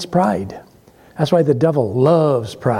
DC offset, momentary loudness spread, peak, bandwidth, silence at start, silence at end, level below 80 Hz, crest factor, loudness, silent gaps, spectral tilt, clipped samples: under 0.1%; 11 LU; -2 dBFS; 15.5 kHz; 0 s; 0 s; -52 dBFS; 14 dB; -16 LUFS; none; -7.5 dB/octave; under 0.1%